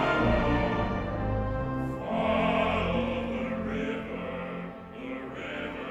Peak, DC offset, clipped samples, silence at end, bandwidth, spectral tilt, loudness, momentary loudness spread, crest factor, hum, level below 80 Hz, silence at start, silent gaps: -14 dBFS; under 0.1%; under 0.1%; 0 s; 9.8 kHz; -7.5 dB/octave; -30 LUFS; 12 LU; 16 dB; none; -40 dBFS; 0 s; none